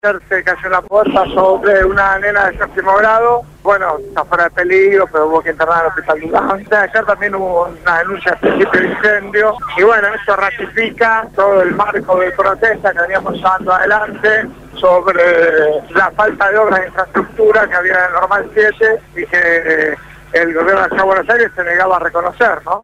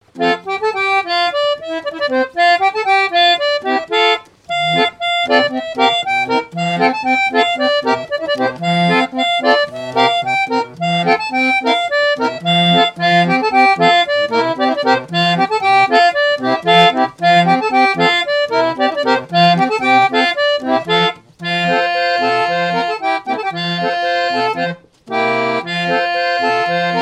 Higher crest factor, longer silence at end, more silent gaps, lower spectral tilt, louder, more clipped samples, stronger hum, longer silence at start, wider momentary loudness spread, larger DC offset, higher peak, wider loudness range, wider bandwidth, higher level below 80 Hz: about the same, 12 dB vs 14 dB; about the same, 0.05 s vs 0 s; neither; about the same, -5.5 dB/octave vs -4.5 dB/octave; about the same, -12 LUFS vs -14 LUFS; neither; neither; about the same, 0.05 s vs 0.15 s; about the same, 5 LU vs 7 LU; neither; about the same, -2 dBFS vs 0 dBFS; about the same, 2 LU vs 4 LU; first, 14 kHz vs 11 kHz; first, -40 dBFS vs -60 dBFS